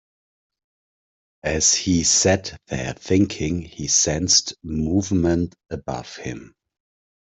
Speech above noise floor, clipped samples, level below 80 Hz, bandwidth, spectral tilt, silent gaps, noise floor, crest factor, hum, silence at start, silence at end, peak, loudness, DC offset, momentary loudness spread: over 69 dB; under 0.1%; -46 dBFS; 8.4 kHz; -3 dB/octave; none; under -90 dBFS; 20 dB; none; 1.45 s; 0.8 s; -4 dBFS; -20 LUFS; under 0.1%; 15 LU